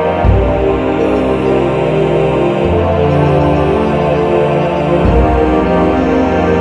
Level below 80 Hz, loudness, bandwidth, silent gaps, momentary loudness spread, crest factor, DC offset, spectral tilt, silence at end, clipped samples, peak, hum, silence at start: -22 dBFS; -12 LUFS; 9.8 kHz; none; 2 LU; 10 dB; 0.5%; -8.5 dB/octave; 0 s; under 0.1%; 0 dBFS; none; 0 s